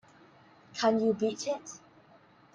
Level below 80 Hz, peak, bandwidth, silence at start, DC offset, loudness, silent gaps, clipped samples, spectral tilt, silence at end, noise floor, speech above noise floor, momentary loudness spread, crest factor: -76 dBFS; -14 dBFS; 10 kHz; 0.75 s; under 0.1%; -30 LUFS; none; under 0.1%; -4.5 dB/octave; 0.75 s; -60 dBFS; 30 dB; 19 LU; 20 dB